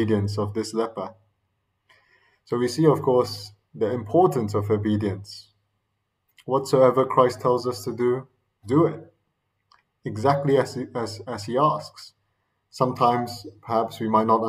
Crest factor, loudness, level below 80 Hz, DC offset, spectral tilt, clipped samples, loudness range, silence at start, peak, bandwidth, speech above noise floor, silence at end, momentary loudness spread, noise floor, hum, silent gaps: 20 dB; -23 LUFS; -66 dBFS; under 0.1%; -7 dB/octave; under 0.1%; 3 LU; 0 s; -4 dBFS; 15.5 kHz; 53 dB; 0 s; 16 LU; -76 dBFS; none; none